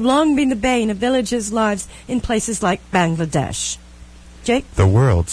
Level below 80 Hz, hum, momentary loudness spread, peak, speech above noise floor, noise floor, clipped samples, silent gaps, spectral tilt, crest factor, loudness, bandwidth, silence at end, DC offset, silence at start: -36 dBFS; none; 9 LU; -4 dBFS; 23 dB; -40 dBFS; under 0.1%; none; -5.5 dB/octave; 14 dB; -18 LUFS; 11 kHz; 0 s; under 0.1%; 0 s